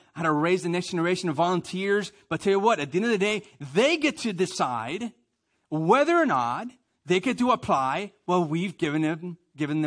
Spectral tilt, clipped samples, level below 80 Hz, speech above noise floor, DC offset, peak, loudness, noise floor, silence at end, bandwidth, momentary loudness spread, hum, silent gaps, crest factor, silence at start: -5.5 dB/octave; under 0.1%; -66 dBFS; 49 dB; under 0.1%; -6 dBFS; -25 LUFS; -73 dBFS; 0 s; 10.5 kHz; 11 LU; none; none; 18 dB; 0.15 s